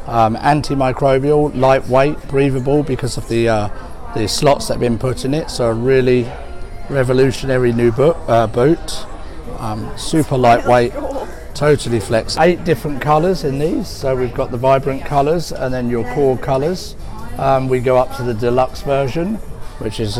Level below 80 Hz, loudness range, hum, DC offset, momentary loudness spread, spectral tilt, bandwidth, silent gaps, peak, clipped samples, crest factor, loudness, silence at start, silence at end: -30 dBFS; 2 LU; none; under 0.1%; 13 LU; -6 dB/octave; 16.5 kHz; none; -4 dBFS; under 0.1%; 12 dB; -16 LUFS; 0 s; 0 s